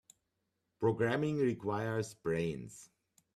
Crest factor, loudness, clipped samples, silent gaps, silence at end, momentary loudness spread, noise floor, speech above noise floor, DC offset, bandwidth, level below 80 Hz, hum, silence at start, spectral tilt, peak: 18 dB; -35 LUFS; under 0.1%; none; 0.5 s; 12 LU; -84 dBFS; 50 dB; under 0.1%; 13.5 kHz; -68 dBFS; none; 0.8 s; -6.5 dB/octave; -18 dBFS